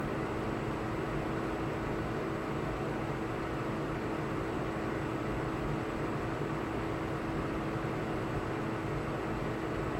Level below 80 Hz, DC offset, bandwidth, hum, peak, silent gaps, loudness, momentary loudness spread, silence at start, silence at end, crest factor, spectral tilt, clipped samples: -48 dBFS; under 0.1%; 16 kHz; none; -22 dBFS; none; -35 LUFS; 1 LU; 0 s; 0 s; 12 dB; -7 dB/octave; under 0.1%